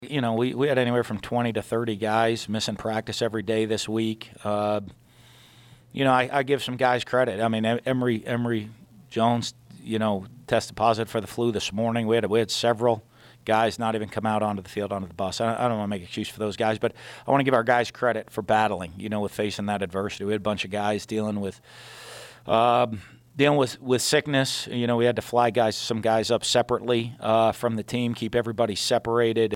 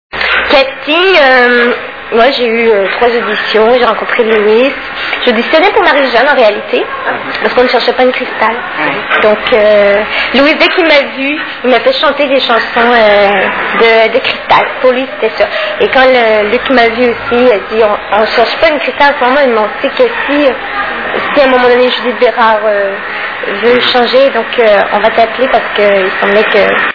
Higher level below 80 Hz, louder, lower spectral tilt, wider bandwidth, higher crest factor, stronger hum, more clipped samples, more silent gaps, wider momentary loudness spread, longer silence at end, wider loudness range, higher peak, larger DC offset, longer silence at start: second, -60 dBFS vs -42 dBFS; second, -25 LUFS vs -8 LUFS; about the same, -5 dB/octave vs -5 dB/octave; first, 17 kHz vs 5.4 kHz; first, 18 dB vs 8 dB; neither; second, under 0.1% vs 2%; neither; about the same, 9 LU vs 7 LU; about the same, 0 s vs 0 s; about the same, 4 LU vs 2 LU; second, -6 dBFS vs 0 dBFS; second, under 0.1% vs 0.5%; second, 0 s vs 0.15 s